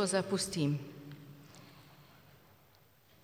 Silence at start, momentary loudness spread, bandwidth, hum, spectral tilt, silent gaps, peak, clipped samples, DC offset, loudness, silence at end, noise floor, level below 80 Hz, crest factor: 0 s; 26 LU; 18 kHz; none; -4.5 dB/octave; none; -18 dBFS; under 0.1%; under 0.1%; -35 LUFS; 1.2 s; -65 dBFS; -74 dBFS; 20 dB